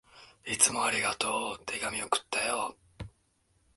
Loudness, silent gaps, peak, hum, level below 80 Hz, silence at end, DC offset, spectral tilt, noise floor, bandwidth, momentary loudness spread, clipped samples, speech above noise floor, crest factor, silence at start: -29 LUFS; none; -6 dBFS; none; -62 dBFS; 0.7 s; under 0.1%; -0.5 dB/octave; -71 dBFS; 12 kHz; 23 LU; under 0.1%; 40 dB; 28 dB; 0.15 s